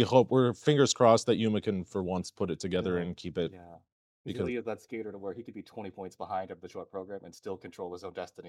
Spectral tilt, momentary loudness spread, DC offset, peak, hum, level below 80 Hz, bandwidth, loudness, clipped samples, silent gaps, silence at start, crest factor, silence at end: -5.5 dB/octave; 19 LU; under 0.1%; -8 dBFS; none; -66 dBFS; 12 kHz; -30 LUFS; under 0.1%; 3.92-4.24 s; 0 s; 22 dB; 0 s